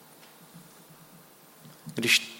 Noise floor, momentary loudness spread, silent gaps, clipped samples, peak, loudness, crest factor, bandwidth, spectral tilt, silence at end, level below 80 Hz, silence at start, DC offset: -54 dBFS; 29 LU; none; under 0.1%; -8 dBFS; -26 LUFS; 26 dB; 16.5 kHz; -1.5 dB/octave; 0 s; -80 dBFS; 0.55 s; under 0.1%